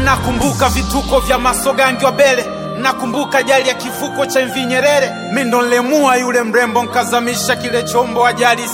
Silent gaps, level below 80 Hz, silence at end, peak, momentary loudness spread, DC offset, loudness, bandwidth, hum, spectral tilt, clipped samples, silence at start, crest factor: none; -32 dBFS; 0 s; 0 dBFS; 5 LU; under 0.1%; -14 LUFS; 17 kHz; none; -3.5 dB/octave; under 0.1%; 0 s; 14 dB